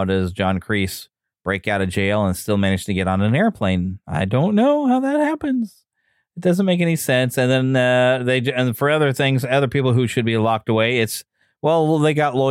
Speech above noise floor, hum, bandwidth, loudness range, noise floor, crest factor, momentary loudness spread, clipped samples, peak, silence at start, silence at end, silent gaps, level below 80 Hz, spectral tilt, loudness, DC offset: 50 dB; none; 16.5 kHz; 3 LU; -68 dBFS; 12 dB; 7 LU; under 0.1%; -6 dBFS; 0 s; 0 s; none; -50 dBFS; -6 dB/octave; -19 LUFS; under 0.1%